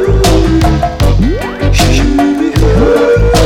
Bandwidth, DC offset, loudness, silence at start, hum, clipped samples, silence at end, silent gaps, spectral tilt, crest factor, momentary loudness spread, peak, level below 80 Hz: 16.5 kHz; under 0.1%; -10 LUFS; 0 s; none; under 0.1%; 0 s; none; -6 dB/octave; 6 dB; 4 LU; -2 dBFS; -14 dBFS